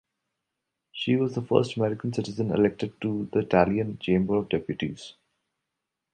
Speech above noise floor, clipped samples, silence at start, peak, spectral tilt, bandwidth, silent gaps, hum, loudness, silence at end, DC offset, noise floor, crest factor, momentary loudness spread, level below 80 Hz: 59 dB; under 0.1%; 0.95 s; -4 dBFS; -7 dB/octave; 9.2 kHz; none; none; -26 LUFS; 1 s; under 0.1%; -84 dBFS; 22 dB; 10 LU; -56 dBFS